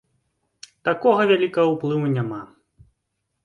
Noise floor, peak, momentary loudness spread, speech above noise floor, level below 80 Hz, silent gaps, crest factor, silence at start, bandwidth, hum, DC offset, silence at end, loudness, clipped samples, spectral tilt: -77 dBFS; -4 dBFS; 11 LU; 57 dB; -64 dBFS; none; 18 dB; 0.85 s; 11 kHz; none; under 0.1%; 1 s; -21 LUFS; under 0.1%; -7 dB/octave